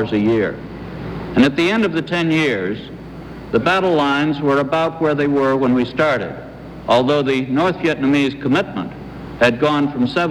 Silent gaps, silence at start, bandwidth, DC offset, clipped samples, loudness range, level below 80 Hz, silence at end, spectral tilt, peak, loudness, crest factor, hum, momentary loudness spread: none; 0 s; 11.5 kHz; under 0.1%; under 0.1%; 2 LU; -44 dBFS; 0 s; -6.5 dB/octave; -2 dBFS; -17 LUFS; 16 dB; none; 15 LU